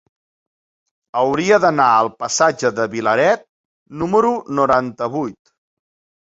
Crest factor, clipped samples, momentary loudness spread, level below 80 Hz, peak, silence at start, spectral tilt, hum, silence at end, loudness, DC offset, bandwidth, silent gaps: 18 dB; under 0.1%; 11 LU; -56 dBFS; -2 dBFS; 1.15 s; -4 dB/octave; none; 0.9 s; -17 LUFS; under 0.1%; 8 kHz; 3.49-3.86 s